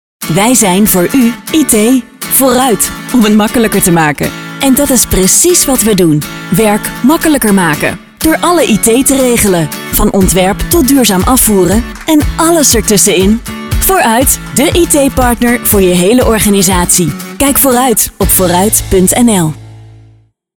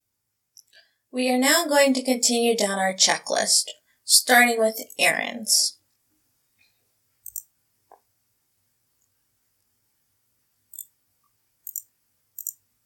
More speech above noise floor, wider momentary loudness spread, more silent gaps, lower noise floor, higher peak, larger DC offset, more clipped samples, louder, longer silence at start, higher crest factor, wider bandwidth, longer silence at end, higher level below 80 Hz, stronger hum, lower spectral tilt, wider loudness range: second, 36 dB vs 57 dB; second, 6 LU vs 22 LU; neither; second, -44 dBFS vs -78 dBFS; about the same, 0 dBFS vs -2 dBFS; first, 0.5% vs under 0.1%; first, 0.2% vs under 0.1%; first, -8 LUFS vs -20 LUFS; second, 0.2 s vs 1.15 s; second, 8 dB vs 24 dB; first, over 20 kHz vs 17.5 kHz; first, 0.65 s vs 0.35 s; first, -24 dBFS vs -86 dBFS; neither; first, -4 dB/octave vs -0.5 dB/octave; second, 1 LU vs 21 LU